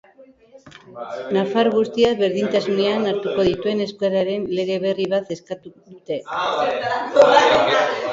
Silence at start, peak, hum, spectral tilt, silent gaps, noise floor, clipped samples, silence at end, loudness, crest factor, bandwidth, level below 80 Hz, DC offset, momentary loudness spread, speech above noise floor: 0.2 s; 0 dBFS; none; -5 dB/octave; none; -49 dBFS; under 0.1%; 0 s; -19 LUFS; 20 dB; 7.8 kHz; -56 dBFS; under 0.1%; 15 LU; 30 dB